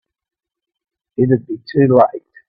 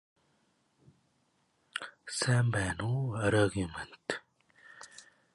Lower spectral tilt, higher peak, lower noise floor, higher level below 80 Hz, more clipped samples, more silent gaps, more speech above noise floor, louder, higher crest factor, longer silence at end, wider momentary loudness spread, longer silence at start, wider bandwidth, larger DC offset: first, -11 dB/octave vs -5 dB/octave; first, 0 dBFS vs -14 dBFS; first, -83 dBFS vs -74 dBFS; about the same, -56 dBFS vs -56 dBFS; neither; neither; first, 69 dB vs 43 dB; first, -15 LUFS vs -33 LUFS; about the same, 18 dB vs 20 dB; about the same, 0.3 s vs 0.35 s; second, 9 LU vs 21 LU; second, 1.2 s vs 1.75 s; second, 5.2 kHz vs 11.5 kHz; neither